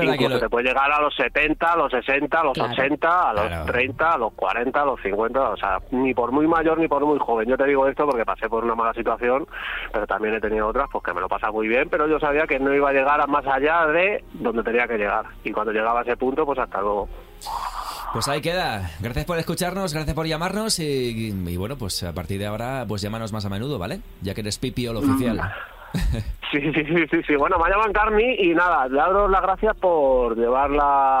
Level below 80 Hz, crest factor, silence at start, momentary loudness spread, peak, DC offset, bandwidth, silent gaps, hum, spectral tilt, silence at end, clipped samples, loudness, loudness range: -38 dBFS; 14 dB; 0 s; 9 LU; -6 dBFS; under 0.1%; 16 kHz; none; none; -5 dB/octave; 0 s; under 0.1%; -22 LUFS; 7 LU